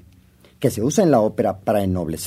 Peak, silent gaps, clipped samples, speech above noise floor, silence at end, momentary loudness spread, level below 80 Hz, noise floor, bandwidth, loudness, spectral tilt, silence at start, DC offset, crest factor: -4 dBFS; none; under 0.1%; 33 dB; 0 s; 7 LU; -50 dBFS; -51 dBFS; 16 kHz; -20 LUFS; -6 dB/octave; 0.6 s; under 0.1%; 16 dB